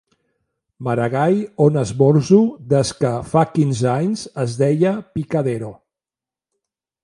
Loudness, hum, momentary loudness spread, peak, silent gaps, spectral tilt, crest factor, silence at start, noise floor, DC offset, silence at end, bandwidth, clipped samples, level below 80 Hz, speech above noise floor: -18 LUFS; none; 9 LU; 0 dBFS; none; -7 dB/octave; 18 dB; 0.8 s; -90 dBFS; under 0.1%; 1.3 s; 11.5 kHz; under 0.1%; -52 dBFS; 73 dB